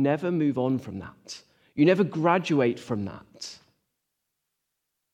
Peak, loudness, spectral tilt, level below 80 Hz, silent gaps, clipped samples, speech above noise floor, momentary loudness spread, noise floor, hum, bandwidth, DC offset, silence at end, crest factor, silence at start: -8 dBFS; -25 LUFS; -6.5 dB/octave; -70 dBFS; none; under 0.1%; 56 dB; 18 LU; -81 dBFS; none; 10 kHz; under 0.1%; 1.6 s; 20 dB; 0 s